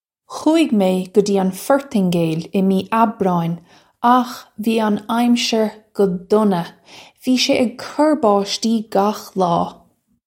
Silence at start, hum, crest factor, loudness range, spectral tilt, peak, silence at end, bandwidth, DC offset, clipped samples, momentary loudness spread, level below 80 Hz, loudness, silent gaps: 0.3 s; none; 16 dB; 1 LU; -5.5 dB/octave; 0 dBFS; 0.55 s; 16.5 kHz; under 0.1%; under 0.1%; 7 LU; -60 dBFS; -18 LUFS; none